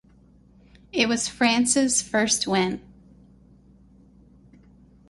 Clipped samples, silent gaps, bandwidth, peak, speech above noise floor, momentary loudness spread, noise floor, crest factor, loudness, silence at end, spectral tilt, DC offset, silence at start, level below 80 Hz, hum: under 0.1%; none; 11.5 kHz; -6 dBFS; 32 dB; 8 LU; -55 dBFS; 20 dB; -22 LUFS; 2.3 s; -2.5 dB/octave; under 0.1%; 0.95 s; -56 dBFS; none